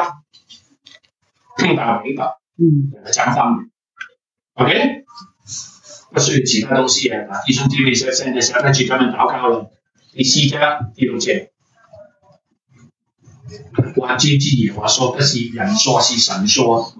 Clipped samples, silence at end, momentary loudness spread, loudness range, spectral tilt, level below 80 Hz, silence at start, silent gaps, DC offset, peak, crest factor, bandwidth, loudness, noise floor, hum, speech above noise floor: under 0.1%; 0 s; 12 LU; 5 LU; -3.5 dB/octave; -58 dBFS; 0 s; none; under 0.1%; -2 dBFS; 16 dB; 8.2 kHz; -15 LUFS; -61 dBFS; none; 46 dB